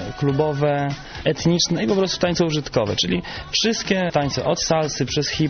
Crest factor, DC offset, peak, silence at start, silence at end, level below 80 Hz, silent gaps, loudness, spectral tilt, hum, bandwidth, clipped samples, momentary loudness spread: 16 dB; under 0.1%; -6 dBFS; 0 s; 0 s; -44 dBFS; none; -21 LUFS; -4.5 dB/octave; none; 6.8 kHz; under 0.1%; 5 LU